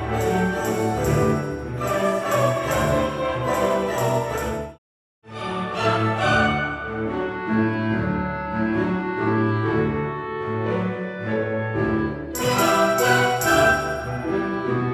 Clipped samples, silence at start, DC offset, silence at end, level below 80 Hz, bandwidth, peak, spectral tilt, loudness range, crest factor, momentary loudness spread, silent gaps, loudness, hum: under 0.1%; 0 s; under 0.1%; 0 s; -42 dBFS; 17 kHz; -4 dBFS; -5.5 dB/octave; 4 LU; 18 dB; 9 LU; 4.78-5.22 s; -22 LUFS; none